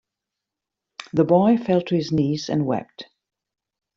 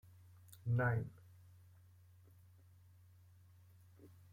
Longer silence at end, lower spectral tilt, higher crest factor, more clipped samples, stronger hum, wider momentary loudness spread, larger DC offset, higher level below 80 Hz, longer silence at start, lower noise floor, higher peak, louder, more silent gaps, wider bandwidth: first, 0.95 s vs 0.25 s; about the same, -7.5 dB/octave vs -8.5 dB/octave; about the same, 18 dB vs 22 dB; neither; neither; second, 23 LU vs 29 LU; neither; first, -58 dBFS vs -72 dBFS; first, 1 s vs 0.5 s; first, -85 dBFS vs -65 dBFS; first, -4 dBFS vs -24 dBFS; first, -21 LUFS vs -39 LUFS; neither; second, 7.6 kHz vs 16 kHz